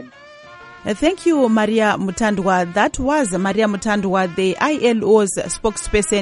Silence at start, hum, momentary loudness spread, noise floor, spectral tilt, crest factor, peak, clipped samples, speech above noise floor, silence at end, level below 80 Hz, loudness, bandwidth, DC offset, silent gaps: 0 s; none; 5 LU; -41 dBFS; -4.5 dB/octave; 16 dB; -2 dBFS; under 0.1%; 24 dB; 0 s; -38 dBFS; -17 LUFS; 11.5 kHz; under 0.1%; none